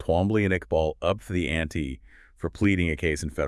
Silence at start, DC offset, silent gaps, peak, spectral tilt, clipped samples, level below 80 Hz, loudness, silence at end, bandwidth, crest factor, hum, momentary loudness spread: 0 s; under 0.1%; none; -10 dBFS; -6.5 dB/octave; under 0.1%; -42 dBFS; -26 LUFS; 0 s; 12 kHz; 16 dB; none; 12 LU